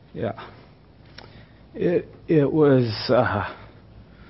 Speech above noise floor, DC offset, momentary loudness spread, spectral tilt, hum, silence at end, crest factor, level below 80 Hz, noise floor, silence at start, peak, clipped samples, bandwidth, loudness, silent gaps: 29 dB; under 0.1%; 22 LU; -11 dB/octave; none; 0.3 s; 18 dB; -52 dBFS; -50 dBFS; 0.15 s; -6 dBFS; under 0.1%; 5.8 kHz; -22 LUFS; none